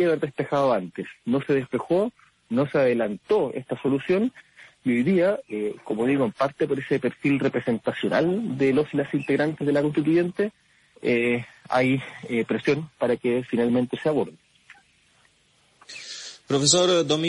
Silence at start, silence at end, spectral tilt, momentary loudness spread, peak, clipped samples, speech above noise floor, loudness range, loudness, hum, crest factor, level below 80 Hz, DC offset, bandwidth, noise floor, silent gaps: 0 s; 0 s; -5 dB/octave; 8 LU; -4 dBFS; under 0.1%; 39 dB; 3 LU; -24 LUFS; none; 20 dB; -64 dBFS; under 0.1%; 11.5 kHz; -62 dBFS; none